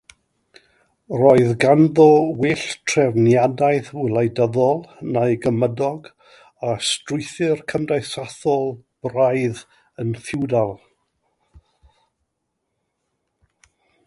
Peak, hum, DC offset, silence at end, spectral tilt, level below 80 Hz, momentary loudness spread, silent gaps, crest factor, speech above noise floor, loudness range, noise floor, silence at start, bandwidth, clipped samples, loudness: 0 dBFS; none; under 0.1%; 3.3 s; -6 dB/octave; -58 dBFS; 13 LU; none; 20 dB; 58 dB; 12 LU; -76 dBFS; 1.1 s; 11.5 kHz; under 0.1%; -19 LUFS